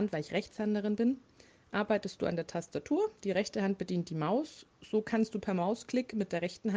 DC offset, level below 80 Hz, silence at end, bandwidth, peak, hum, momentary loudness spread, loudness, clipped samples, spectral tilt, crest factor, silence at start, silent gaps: under 0.1%; -70 dBFS; 0 s; 9.6 kHz; -18 dBFS; none; 5 LU; -34 LUFS; under 0.1%; -6.5 dB/octave; 16 dB; 0 s; none